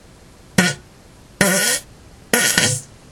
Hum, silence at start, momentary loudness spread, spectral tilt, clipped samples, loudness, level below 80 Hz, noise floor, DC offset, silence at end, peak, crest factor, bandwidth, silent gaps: none; 0.6 s; 8 LU; -2.5 dB/octave; under 0.1%; -17 LUFS; -50 dBFS; -45 dBFS; under 0.1%; 0.25 s; 0 dBFS; 20 dB; 19 kHz; none